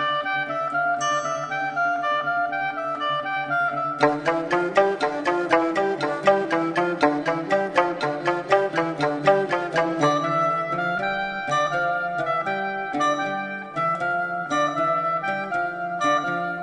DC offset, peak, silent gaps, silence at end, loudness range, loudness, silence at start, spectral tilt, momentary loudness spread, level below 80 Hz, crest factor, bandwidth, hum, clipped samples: under 0.1%; -2 dBFS; none; 0 s; 2 LU; -23 LUFS; 0 s; -5 dB/octave; 5 LU; -62 dBFS; 22 dB; 10 kHz; none; under 0.1%